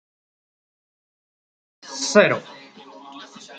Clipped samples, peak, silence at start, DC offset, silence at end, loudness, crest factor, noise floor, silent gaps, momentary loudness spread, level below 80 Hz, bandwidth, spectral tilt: under 0.1%; -2 dBFS; 1.85 s; under 0.1%; 0 s; -19 LUFS; 24 dB; -44 dBFS; none; 25 LU; -74 dBFS; 9.2 kHz; -3.5 dB/octave